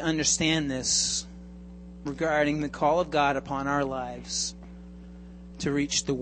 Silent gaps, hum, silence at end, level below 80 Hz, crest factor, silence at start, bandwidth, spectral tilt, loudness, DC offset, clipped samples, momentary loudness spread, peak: none; none; 0 s; -48 dBFS; 18 dB; 0 s; 8.8 kHz; -3 dB/octave; -27 LUFS; under 0.1%; under 0.1%; 22 LU; -10 dBFS